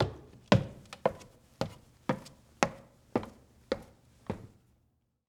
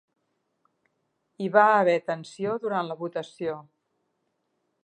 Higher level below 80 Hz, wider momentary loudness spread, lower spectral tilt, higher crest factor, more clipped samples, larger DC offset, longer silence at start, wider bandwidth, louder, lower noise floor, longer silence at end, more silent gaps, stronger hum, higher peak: first, -56 dBFS vs -78 dBFS; first, 21 LU vs 14 LU; about the same, -6 dB/octave vs -6 dB/octave; first, 30 dB vs 24 dB; neither; neither; second, 0 s vs 1.4 s; first, 15.5 kHz vs 9.8 kHz; second, -35 LUFS vs -25 LUFS; about the same, -74 dBFS vs -76 dBFS; second, 0.8 s vs 1.25 s; neither; neither; about the same, -6 dBFS vs -4 dBFS